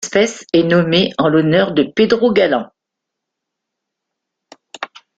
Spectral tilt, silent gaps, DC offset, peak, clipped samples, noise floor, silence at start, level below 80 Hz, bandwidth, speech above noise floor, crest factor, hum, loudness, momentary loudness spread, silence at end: -5.5 dB/octave; none; under 0.1%; 0 dBFS; under 0.1%; -80 dBFS; 0 s; -54 dBFS; 9.2 kHz; 66 dB; 16 dB; none; -14 LUFS; 17 LU; 0.3 s